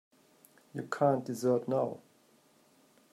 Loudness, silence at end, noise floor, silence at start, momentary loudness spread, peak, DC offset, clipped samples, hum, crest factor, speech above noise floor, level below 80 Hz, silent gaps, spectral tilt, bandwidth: -32 LUFS; 1.15 s; -66 dBFS; 0.75 s; 15 LU; -14 dBFS; under 0.1%; under 0.1%; none; 20 dB; 35 dB; -82 dBFS; none; -7 dB/octave; 15.5 kHz